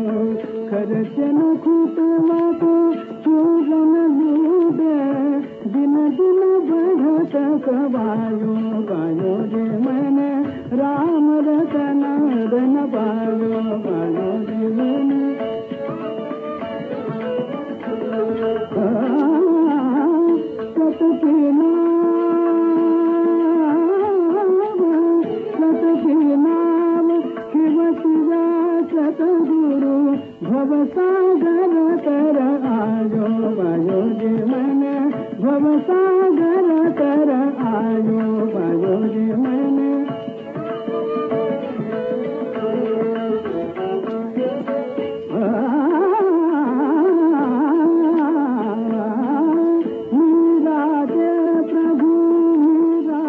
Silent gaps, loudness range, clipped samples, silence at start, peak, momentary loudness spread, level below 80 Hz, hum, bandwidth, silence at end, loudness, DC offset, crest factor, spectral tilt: none; 6 LU; under 0.1%; 0 s; -8 dBFS; 8 LU; -66 dBFS; none; 3.7 kHz; 0 s; -18 LUFS; under 0.1%; 10 dB; -7.5 dB/octave